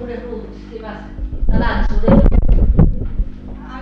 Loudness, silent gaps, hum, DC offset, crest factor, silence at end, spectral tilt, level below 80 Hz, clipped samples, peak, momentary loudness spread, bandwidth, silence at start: -17 LUFS; none; none; under 0.1%; 14 dB; 0 s; -10 dB/octave; -16 dBFS; under 0.1%; 0 dBFS; 18 LU; 5.2 kHz; 0 s